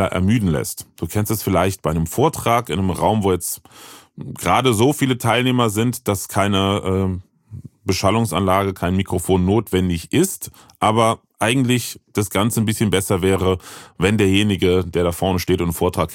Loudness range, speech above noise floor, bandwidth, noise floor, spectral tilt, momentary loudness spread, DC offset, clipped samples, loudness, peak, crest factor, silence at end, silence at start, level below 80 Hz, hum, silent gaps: 2 LU; 20 dB; 17 kHz; -38 dBFS; -5 dB/octave; 9 LU; under 0.1%; under 0.1%; -19 LUFS; -2 dBFS; 18 dB; 0 s; 0 s; -42 dBFS; none; none